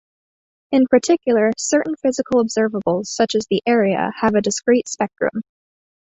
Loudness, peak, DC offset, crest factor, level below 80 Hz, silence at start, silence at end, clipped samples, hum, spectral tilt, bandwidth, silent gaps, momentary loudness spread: -18 LUFS; -2 dBFS; under 0.1%; 16 dB; -58 dBFS; 0.7 s; 0.75 s; under 0.1%; none; -4.5 dB/octave; 8.4 kHz; none; 6 LU